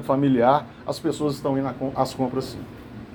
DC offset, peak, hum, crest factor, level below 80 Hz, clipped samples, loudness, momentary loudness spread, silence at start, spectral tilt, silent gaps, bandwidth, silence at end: under 0.1%; -4 dBFS; none; 20 dB; -52 dBFS; under 0.1%; -24 LUFS; 17 LU; 0 s; -7 dB/octave; none; 19.5 kHz; 0 s